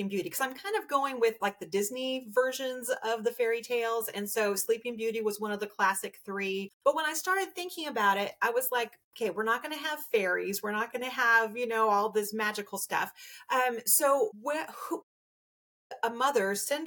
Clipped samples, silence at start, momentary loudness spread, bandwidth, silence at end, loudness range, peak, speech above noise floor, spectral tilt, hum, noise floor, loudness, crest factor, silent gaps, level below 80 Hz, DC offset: under 0.1%; 0 s; 9 LU; 19 kHz; 0 s; 3 LU; -12 dBFS; over 60 dB; -2 dB/octave; none; under -90 dBFS; -30 LUFS; 20 dB; 6.73-6.80 s, 9.04-9.11 s, 15.03-15.90 s; -84 dBFS; under 0.1%